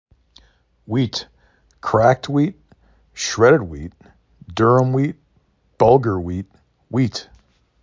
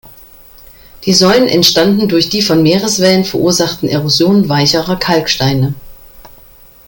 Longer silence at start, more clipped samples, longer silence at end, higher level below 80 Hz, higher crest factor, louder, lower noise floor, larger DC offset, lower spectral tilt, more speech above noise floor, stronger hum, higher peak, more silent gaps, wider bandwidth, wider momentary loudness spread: first, 0.9 s vs 0.05 s; neither; about the same, 0.6 s vs 0.6 s; about the same, -44 dBFS vs -42 dBFS; first, 20 dB vs 12 dB; second, -18 LUFS vs -10 LUFS; first, -61 dBFS vs -40 dBFS; neither; first, -6 dB/octave vs -4.5 dB/octave; first, 44 dB vs 29 dB; neither; about the same, 0 dBFS vs 0 dBFS; neither; second, 7.6 kHz vs 17 kHz; first, 17 LU vs 6 LU